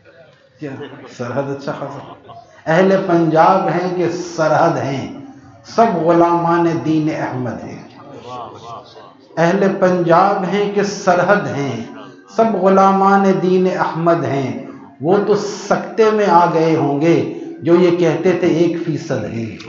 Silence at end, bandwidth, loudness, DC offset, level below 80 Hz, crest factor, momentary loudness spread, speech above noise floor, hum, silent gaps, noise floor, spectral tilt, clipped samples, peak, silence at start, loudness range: 0 s; 7.4 kHz; -15 LUFS; under 0.1%; -62 dBFS; 16 dB; 19 LU; 31 dB; none; none; -46 dBFS; -7 dB/octave; under 0.1%; 0 dBFS; 0.6 s; 4 LU